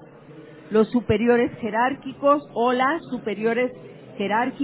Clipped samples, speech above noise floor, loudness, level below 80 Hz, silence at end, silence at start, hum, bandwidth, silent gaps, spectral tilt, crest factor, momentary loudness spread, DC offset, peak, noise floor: under 0.1%; 22 dB; -22 LUFS; -54 dBFS; 0 s; 0.3 s; none; 4 kHz; none; -10 dB/octave; 18 dB; 8 LU; under 0.1%; -6 dBFS; -44 dBFS